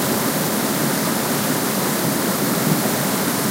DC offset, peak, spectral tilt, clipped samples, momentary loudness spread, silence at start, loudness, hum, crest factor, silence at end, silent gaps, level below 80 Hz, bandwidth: under 0.1%; -4 dBFS; -3.5 dB/octave; under 0.1%; 1 LU; 0 s; -19 LUFS; none; 14 dB; 0 s; none; -58 dBFS; 16 kHz